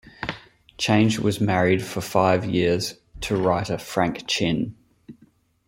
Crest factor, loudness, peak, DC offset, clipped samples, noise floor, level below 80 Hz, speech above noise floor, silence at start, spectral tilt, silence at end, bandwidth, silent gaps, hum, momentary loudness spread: 20 dB; -23 LUFS; -4 dBFS; under 0.1%; under 0.1%; -58 dBFS; -50 dBFS; 37 dB; 0.2 s; -5.5 dB/octave; 0.55 s; 16.5 kHz; none; none; 13 LU